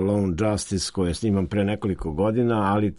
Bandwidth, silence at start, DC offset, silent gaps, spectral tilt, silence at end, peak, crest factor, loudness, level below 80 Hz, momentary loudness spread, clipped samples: 11.5 kHz; 0 s; under 0.1%; none; -6 dB/octave; 0 s; -10 dBFS; 14 dB; -24 LUFS; -42 dBFS; 4 LU; under 0.1%